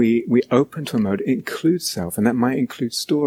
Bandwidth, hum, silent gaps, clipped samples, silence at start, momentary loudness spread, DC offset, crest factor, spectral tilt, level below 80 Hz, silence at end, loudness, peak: 16 kHz; none; none; under 0.1%; 0 s; 6 LU; under 0.1%; 18 dB; -5.5 dB/octave; -58 dBFS; 0 s; -20 LUFS; -2 dBFS